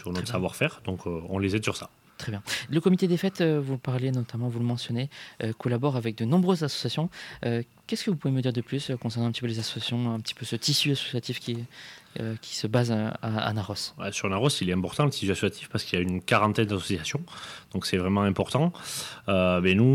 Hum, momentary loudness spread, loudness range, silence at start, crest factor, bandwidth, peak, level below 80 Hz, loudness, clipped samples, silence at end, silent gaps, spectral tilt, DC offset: none; 11 LU; 3 LU; 0 s; 18 dB; 16 kHz; -8 dBFS; -60 dBFS; -28 LUFS; under 0.1%; 0 s; none; -5.5 dB/octave; under 0.1%